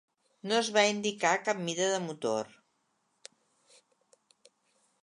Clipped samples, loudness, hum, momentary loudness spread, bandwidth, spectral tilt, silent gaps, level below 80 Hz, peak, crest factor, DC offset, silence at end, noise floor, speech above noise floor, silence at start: under 0.1%; -29 LUFS; none; 9 LU; 11 kHz; -3 dB/octave; none; -84 dBFS; -10 dBFS; 24 dB; under 0.1%; 2.55 s; -76 dBFS; 46 dB; 0.45 s